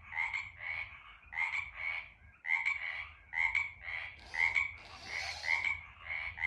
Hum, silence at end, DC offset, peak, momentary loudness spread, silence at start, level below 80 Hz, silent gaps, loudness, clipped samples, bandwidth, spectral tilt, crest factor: none; 0 s; under 0.1%; -18 dBFS; 12 LU; 0 s; -62 dBFS; none; -35 LUFS; under 0.1%; 12 kHz; -1 dB/octave; 20 dB